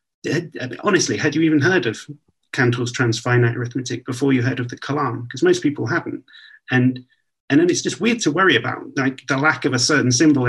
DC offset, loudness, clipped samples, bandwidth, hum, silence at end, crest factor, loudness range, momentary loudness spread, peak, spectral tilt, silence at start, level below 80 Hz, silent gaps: under 0.1%; -19 LUFS; under 0.1%; 12 kHz; none; 0 s; 18 dB; 3 LU; 10 LU; -2 dBFS; -4.5 dB/octave; 0.25 s; -62 dBFS; 7.40-7.48 s